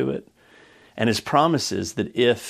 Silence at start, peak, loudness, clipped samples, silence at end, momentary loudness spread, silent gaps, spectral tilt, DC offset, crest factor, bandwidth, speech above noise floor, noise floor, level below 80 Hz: 0 s; -4 dBFS; -22 LUFS; under 0.1%; 0 s; 11 LU; none; -4.5 dB/octave; under 0.1%; 20 dB; 15 kHz; 30 dB; -52 dBFS; -60 dBFS